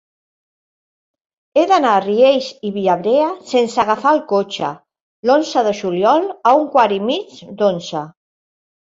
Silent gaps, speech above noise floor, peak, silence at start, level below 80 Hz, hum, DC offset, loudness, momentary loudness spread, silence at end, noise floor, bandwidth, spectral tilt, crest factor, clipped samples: 5.01-5.23 s; over 75 dB; -2 dBFS; 1.55 s; -62 dBFS; none; under 0.1%; -16 LUFS; 11 LU; 0.7 s; under -90 dBFS; 7.8 kHz; -5 dB/octave; 16 dB; under 0.1%